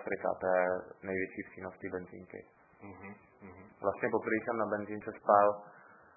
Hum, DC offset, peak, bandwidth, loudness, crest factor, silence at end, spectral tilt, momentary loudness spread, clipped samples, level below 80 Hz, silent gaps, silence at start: none; under 0.1%; -12 dBFS; 2.7 kHz; -33 LUFS; 24 dB; 0.35 s; -0.5 dB/octave; 24 LU; under 0.1%; -68 dBFS; none; 0 s